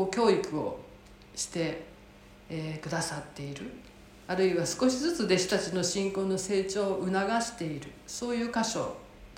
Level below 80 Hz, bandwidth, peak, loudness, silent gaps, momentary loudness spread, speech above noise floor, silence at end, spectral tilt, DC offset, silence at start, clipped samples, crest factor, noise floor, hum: -58 dBFS; 16.5 kHz; -12 dBFS; -30 LUFS; none; 15 LU; 23 dB; 0 s; -4 dB/octave; under 0.1%; 0 s; under 0.1%; 18 dB; -53 dBFS; none